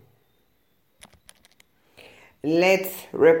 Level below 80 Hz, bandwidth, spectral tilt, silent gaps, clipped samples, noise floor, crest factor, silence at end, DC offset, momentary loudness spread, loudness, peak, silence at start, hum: -70 dBFS; 17 kHz; -5 dB/octave; none; under 0.1%; -68 dBFS; 20 dB; 0 s; under 0.1%; 13 LU; -22 LUFS; -4 dBFS; 2.45 s; none